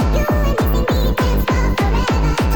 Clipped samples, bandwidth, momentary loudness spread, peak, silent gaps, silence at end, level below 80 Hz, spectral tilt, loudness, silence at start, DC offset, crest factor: under 0.1%; over 20 kHz; 1 LU; -6 dBFS; none; 0 s; -18 dBFS; -6.5 dB/octave; -17 LUFS; 0 s; under 0.1%; 8 dB